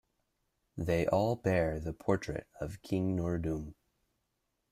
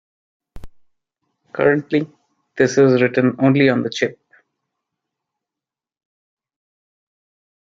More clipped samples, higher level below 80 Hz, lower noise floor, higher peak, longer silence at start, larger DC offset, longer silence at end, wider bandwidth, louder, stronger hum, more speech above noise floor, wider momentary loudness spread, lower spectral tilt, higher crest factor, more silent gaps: neither; about the same, -54 dBFS vs -52 dBFS; second, -82 dBFS vs -88 dBFS; second, -14 dBFS vs -2 dBFS; first, 0.75 s vs 0.55 s; neither; second, 1 s vs 3.6 s; first, 14.5 kHz vs 7.6 kHz; second, -34 LUFS vs -17 LUFS; neither; second, 49 dB vs 72 dB; about the same, 12 LU vs 12 LU; about the same, -7.5 dB/octave vs -6.5 dB/octave; about the same, 20 dB vs 20 dB; neither